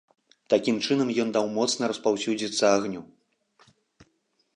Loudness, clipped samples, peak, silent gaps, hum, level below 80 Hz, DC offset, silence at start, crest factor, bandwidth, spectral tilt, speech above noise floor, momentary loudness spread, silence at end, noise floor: -25 LUFS; under 0.1%; -8 dBFS; none; none; -72 dBFS; under 0.1%; 0.5 s; 20 dB; 10.5 kHz; -4 dB/octave; 46 dB; 5 LU; 1.5 s; -71 dBFS